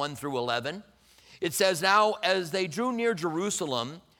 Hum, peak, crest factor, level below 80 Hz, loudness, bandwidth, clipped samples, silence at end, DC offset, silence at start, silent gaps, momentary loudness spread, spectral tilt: none; -8 dBFS; 20 dB; -70 dBFS; -27 LUFS; 19 kHz; under 0.1%; 0.2 s; under 0.1%; 0 s; none; 10 LU; -3 dB/octave